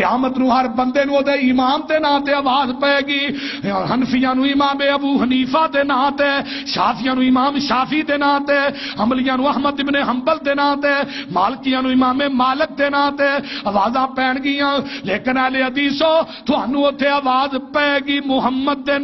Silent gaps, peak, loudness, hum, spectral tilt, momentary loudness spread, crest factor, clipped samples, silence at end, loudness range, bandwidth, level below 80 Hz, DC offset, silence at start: none; -2 dBFS; -17 LUFS; none; -5.5 dB/octave; 4 LU; 14 dB; under 0.1%; 0 s; 1 LU; 6 kHz; -50 dBFS; under 0.1%; 0 s